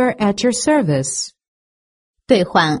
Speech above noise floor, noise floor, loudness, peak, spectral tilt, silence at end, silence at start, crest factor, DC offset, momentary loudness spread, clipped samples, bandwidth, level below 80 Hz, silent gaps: over 74 dB; under -90 dBFS; -17 LUFS; 0 dBFS; -4.5 dB/octave; 0 s; 0 s; 18 dB; under 0.1%; 8 LU; under 0.1%; 11.5 kHz; -52 dBFS; 1.48-2.14 s